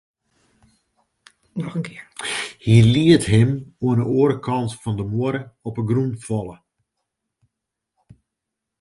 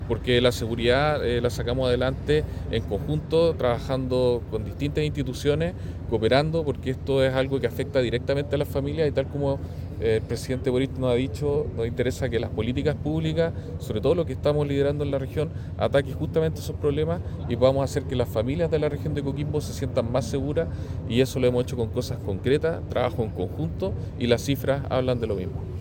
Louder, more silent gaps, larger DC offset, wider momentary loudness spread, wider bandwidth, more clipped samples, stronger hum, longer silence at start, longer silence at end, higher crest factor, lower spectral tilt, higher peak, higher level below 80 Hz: first, -20 LUFS vs -25 LUFS; neither; neither; first, 16 LU vs 7 LU; second, 11.5 kHz vs 17 kHz; neither; neither; first, 1.55 s vs 0 s; first, 2.25 s vs 0 s; about the same, 20 dB vs 20 dB; about the same, -6.5 dB/octave vs -6.5 dB/octave; first, -2 dBFS vs -6 dBFS; second, -48 dBFS vs -40 dBFS